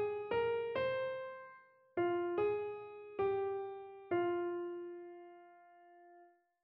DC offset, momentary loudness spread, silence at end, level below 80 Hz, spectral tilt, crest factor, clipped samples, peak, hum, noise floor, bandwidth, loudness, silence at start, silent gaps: under 0.1%; 17 LU; 0.35 s; -74 dBFS; -4.5 dB/octave; 14 dB; under 0.1%; -24 dBFS; none; -65 dBFS; 5.2 kHz; -39 LUFS; 0 s; none